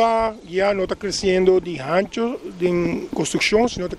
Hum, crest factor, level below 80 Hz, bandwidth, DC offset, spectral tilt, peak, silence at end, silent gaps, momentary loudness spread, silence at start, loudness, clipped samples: none; 16 dB; -44 dBFS; 12.5 kHz; under 0.1%; -4.5 dB/octave; -4 dBFS; 0 s; none; 7 LU; 0 s; -20 LUFS; under 0.1%